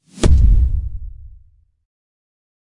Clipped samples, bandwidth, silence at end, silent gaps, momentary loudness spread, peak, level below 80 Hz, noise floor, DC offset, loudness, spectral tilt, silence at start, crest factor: under 0.1%; 11 kHz; 1.35 s; none; 21 LU; -2 dBFS; -18 dBFS; -50 dBFS; under 0.1%; -16 LUFS; -6.5 dB/octave; 0.15 s; 14 dB